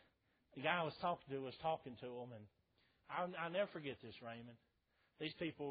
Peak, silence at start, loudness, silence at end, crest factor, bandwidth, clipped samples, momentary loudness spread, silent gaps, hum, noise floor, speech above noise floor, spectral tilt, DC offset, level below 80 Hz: -22 dBFS; 0.55 s; -45 LUFS; 0 s; 24 dB; 4.9 kHz; under 0.1%; 15 LU; none; none; -81 dBFS; 36 dB; -3 dB/octave; under 0.1%; -80 dBFS